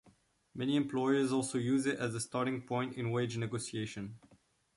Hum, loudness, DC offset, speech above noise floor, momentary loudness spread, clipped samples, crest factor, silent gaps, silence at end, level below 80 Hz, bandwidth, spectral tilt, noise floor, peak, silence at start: none; -35 LUFS; under 0.1%; 34 dB; 9 LU; under 0.1%; 16 dB; none; 0.6 s; -70 dBFS; 11.5 kHz; -5.5 dB/octave; -68 dBFS; -18 dBFS; 0.05 s